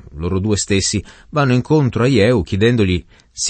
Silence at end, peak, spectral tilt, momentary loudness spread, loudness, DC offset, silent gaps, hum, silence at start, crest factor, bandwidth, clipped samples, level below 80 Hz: 0 s; -2 dBFS; -5 dB/octave; 9 LU; -16 LUFS; under 0.1%; none; none; 0.1 s; 14 dB; 8.8 kHz; under 0.1%; -38 dBFS